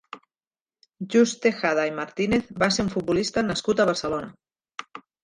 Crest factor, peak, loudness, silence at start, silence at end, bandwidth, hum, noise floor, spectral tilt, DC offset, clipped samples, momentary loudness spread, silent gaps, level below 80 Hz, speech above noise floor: 18 dB; -6 dBFS; -24 LUFS; 0.15 s; 0.25 s; 11 kHz; none; under -90 dBFS; -4.5 dB/octave; under 0.1%; under 0.1%; 19 LU; 0.47-0.51 s, 0.61-0.66 s; -54 dBFS; over 67 dB